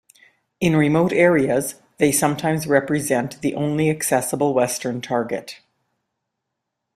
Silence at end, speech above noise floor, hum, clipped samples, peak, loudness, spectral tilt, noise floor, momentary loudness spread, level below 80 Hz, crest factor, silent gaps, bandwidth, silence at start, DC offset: 1.4 s; 60 dB; none; under 0.1%; -2 dBFS; -20 LUFS; -5 dB/octave; -80 dBFS; 9 LU; -56 dBFS; 18 dB; none; 16 kHz; 0.6 s; under 0.1%